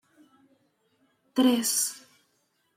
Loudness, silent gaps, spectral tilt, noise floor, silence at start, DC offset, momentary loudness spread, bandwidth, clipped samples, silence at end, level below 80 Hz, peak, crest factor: -25 LUFS; none; -1.5 dB/octave; -72 dBFS; 1.35 s; under 0.1%; 12 LU; 16 kHz; under 0.1%; 0.8 s; -82 dBFS; -10 dBFS; 20 dB